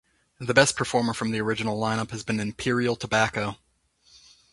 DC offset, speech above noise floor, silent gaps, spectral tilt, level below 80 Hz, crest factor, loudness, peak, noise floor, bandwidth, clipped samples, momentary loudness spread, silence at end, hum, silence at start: under 0.1%; 39 dB; none; -4 dB/octave; -56 dBFS; 26 dB; -25 LUFS; -2 dBFS; -64 dBFS; 11.5 kHz; under 0.1%; 9 LU; 1 s; none; 0.4 s